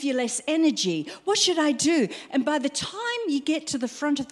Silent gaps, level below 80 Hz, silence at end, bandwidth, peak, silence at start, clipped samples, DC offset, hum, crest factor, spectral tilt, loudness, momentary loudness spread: none; -66 dBFS; 0 s; 12.5 kHz; -8 dBFS; 0 s; under 0.1%; under 0.1%; none; 16 dB; -2.5 dB/octave; -25 LUFS; 7 LU